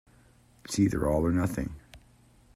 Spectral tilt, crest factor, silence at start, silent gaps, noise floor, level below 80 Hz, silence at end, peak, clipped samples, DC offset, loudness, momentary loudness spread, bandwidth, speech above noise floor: -6.5 dB/octave; 18 dB; 0.7 s; none; -60 dBFS; -46 dBFS; 0.6 s; -14 dBFS; under 0.1%; under 0.1%; -28 LUFS; 12 LU; 15.5 kHz; 33 dB